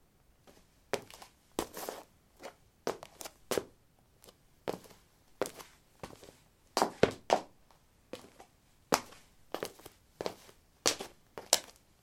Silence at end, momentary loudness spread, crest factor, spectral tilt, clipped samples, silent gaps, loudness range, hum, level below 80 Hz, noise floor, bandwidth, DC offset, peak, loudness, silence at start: 0.3 s; 25 LU; 38 dB; -2.5 dB/octave; under 0.1%; none; 8 LU; none; -66 dBFS; -66 dBFS; 16.5 kHz; under 0.1%; -2 dBFS; -36 LUFS; 0.45 s